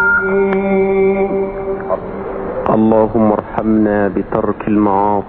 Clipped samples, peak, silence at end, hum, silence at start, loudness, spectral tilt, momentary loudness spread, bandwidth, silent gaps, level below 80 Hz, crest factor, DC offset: under 0.1%; 0 dBFS; 0 s; none; 0 s; -15 LUFS; -7.5 dB/octave; 9 LU; 4.1 kHz; none; -38 dBFS; 14 dB; under 0.1%